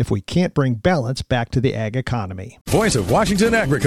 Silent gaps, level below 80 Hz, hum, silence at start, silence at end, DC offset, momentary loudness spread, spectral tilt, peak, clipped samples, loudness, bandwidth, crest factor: 2.61-2.65 s; -38 dBFS; none; 0 s; 0 s; under 0.1%; 8 LU; -5.5 dB/octave; -4 dBFS; under 0.1%; -19 LUFS; 14 kHz; 14 dB